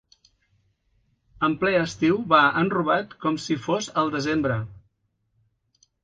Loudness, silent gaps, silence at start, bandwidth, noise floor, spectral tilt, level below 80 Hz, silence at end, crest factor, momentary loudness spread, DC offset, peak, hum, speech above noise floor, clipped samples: -23 LUFS; none; 1.4 s; 9.4 kHz; -72 dBFS; -5.5 dB/octave; -58 dBFS; 1.3 s; 22 dB; 9 LU; under 0.1%; -4 dBFS; none; 50 dB; under 0.1%